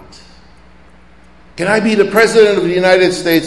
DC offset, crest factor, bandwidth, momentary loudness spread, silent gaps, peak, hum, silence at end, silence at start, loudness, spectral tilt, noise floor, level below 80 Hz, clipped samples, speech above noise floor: 0.6%; 14 dB; 12 kHz; 5 LU; none; 0 dBFS; none; 0 s; 1.55 s; -11 LUFS; -4.5 dB/octave; -44 dBFS; -46 dBFS; 0.1%; 33 dB